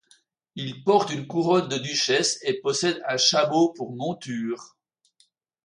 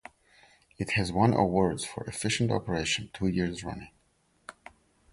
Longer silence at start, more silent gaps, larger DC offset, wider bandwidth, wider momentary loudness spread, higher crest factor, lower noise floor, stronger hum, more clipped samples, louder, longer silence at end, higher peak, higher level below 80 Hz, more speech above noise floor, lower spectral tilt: second, 0.55 s vs 0.8 s; neither; neither; about the same, 11.5 kHz vs 11.5 kHz; second, 12 LU vs 20 LU; about the same, 20 dB vs 20 dB; about the same, -66 dBFS vs -69 dBFS; neither; neither; first, -23 LUFS vs -29 LUFS; first, 1 s vs 0.6 s; first, -6 dBFS vs -10 dBFS; second, -72 dBFS vs -50 dBFS; about the same, 42 dB vs 41 dB; second, -3.5 dB/octave vs -5 dB/octave